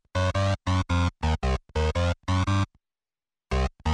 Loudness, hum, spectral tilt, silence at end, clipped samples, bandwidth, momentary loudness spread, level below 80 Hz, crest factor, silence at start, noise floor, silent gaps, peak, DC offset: -27 LUFS; none; -6 dB/octave; 0 s; under 0.1%; 10 kHz; 4 LU; -34 dBFS; 12 dB; 0.15 s; under -90 dBFS; none; -14 dBFS; under 0.1%